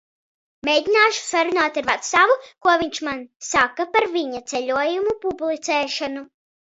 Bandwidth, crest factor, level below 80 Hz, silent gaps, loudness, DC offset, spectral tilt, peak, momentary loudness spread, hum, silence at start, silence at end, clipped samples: 8.2 kHz; 20 dB; -58 dBFS; 3.36-3.40 s; -20 LUFS; under 0.1%; -1.5 dB/octave; -2 dBFS; 10 LU; none; 0.65 s; 0.45 s; under 0.1%